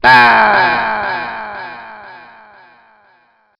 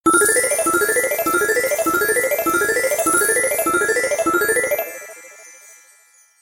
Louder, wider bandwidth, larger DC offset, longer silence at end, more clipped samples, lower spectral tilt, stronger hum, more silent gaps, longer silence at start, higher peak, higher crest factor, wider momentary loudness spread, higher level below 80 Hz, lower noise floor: first, -11 LUFS vs -17 LUFS; second, 13 kHz vs 17 kHz; neither; first, 1.4 s vs 0.9 s; first, 0.4% vs under 0.1%; first, -4.5 dB/octave vs -1.5 dB/octave; neither; neither; about the same, 0.05 s vs 0.05 s; first, 0 dBFS vs -4 dBFS; about the same, 14 dB vs 16 dB; first, 25 LU vs 6 LU; first, -48 dBFS vs -56 dBFS; about the same, -54 dBFS vs -53 dBFS